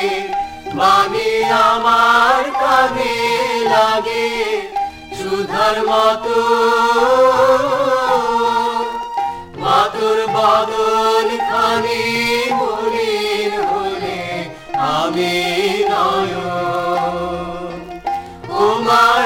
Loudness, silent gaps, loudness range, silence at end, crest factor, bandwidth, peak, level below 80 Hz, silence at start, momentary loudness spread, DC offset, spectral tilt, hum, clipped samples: -16 LUFS; none; 5 LU; 0 s; 14 dB; 16.5 kHz; 0 dBFS; -46 dBFS; 0 s; 11 LU; under 0.1%; -3.5 dB/octave; none; under 0.1%